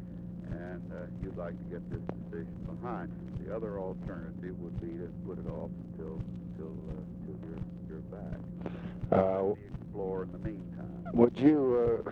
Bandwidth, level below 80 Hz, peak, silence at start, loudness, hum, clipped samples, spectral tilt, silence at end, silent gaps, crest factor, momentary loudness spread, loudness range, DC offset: 6 kHz; -52 dBFS; -10 dBFS; 0 s; -35 LUFS; none; under 0.1%; -10.5 dB/octave; 0 s; none; 24 dB; 15 LU; 11 LU; under 0.1%